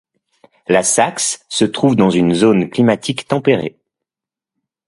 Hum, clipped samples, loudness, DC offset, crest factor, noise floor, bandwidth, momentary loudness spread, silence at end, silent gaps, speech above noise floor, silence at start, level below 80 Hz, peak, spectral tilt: none; under 0.1%; -15 LUFS; under 0.1%; 16 dB; -88 dBFS; 11.5 kHz; 7 LU; 1.2 s; none; 74 dB; 0.7 s; -54 dBFS; 0 dBFS; -4.5 dB/octave